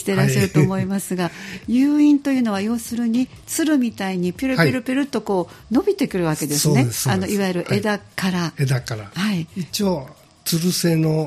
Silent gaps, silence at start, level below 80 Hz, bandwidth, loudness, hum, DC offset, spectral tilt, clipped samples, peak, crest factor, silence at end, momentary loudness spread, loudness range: none; 0 s; -52 dBFS; 15.5 kHz; -20 LUFS; none; under 0.1%; -5.5 dB/octave; under 0.1%; -2 dBFS; 18 dB; 0 s; 7 LU; 3 LU